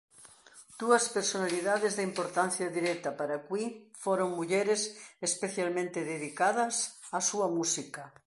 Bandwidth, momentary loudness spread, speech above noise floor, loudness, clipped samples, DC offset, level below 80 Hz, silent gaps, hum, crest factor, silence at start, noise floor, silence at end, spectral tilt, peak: 11.5 kHz; 8 LU; 25 dB; -31 LUFS; under 0.1%; under 0.1%; -82 dBFS; none; none; 22 dB; 0.2 s; -56 dBFS; 0.2 s; -3 dB/octave; -10 dBFS